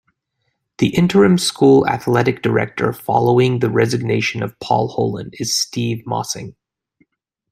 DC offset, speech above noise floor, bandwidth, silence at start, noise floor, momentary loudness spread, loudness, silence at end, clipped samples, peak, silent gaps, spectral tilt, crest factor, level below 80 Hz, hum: under 0.1%; 55 dB; 16 kHz; 0.8 s; -71 dBFS; 10 LU; -17 LUFS; 1 s; under 0.1%; 0 dBFS; none; -5.5 dB/octave; 16 dB; -54 dBFS; none